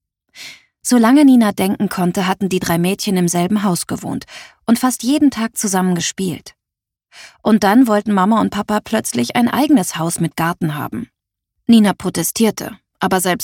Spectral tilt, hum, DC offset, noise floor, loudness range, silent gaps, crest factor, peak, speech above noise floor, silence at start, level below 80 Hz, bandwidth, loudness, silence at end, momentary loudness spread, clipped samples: -5 dB/octave; none; under 0.1%; -84 dBFS; 3 LU; none; 16 dB; 0 dBFS; 69 dB; 0.35 s; -52 dBFS; 18.5 kHz; -16 LUFS; 0 s; 15 LU; under 0.1%